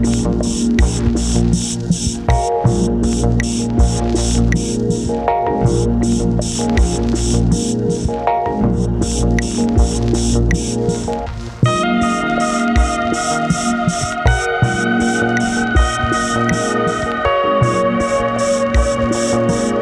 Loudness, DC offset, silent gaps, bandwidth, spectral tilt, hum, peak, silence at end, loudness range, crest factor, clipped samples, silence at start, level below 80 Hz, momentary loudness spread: -16 LUFS; under 0.1%; none; 12 kHz; -5.5 dB/octave; none; 0 dBFS; 0 s; 1 LU; 14 dB; under 0.1%; 0 s; -22 dBFS; 3 LU